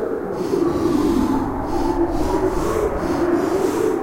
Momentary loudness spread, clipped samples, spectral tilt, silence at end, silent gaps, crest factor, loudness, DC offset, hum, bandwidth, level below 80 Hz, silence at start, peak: 4 LU; under 0.1%; -6.5 dB/octave; 0 s; none; 12 dB; -20 LUFS; under 0.1%; none; 16 kHz; -32 dBFS; 0 s; -8 dBFS